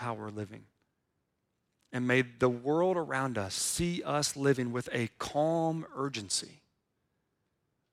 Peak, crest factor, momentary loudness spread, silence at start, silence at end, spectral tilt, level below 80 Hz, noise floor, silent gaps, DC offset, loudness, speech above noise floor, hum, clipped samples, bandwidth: -14 dBFS; 20 dB; 10 LU; 0 s; 1.4 s; -4.5 dB/octave; -62 dBFS; -81 dBFS; none; under 0.1%; -32 LUFS; 49 dB; none; under 0.1%; 16 kHz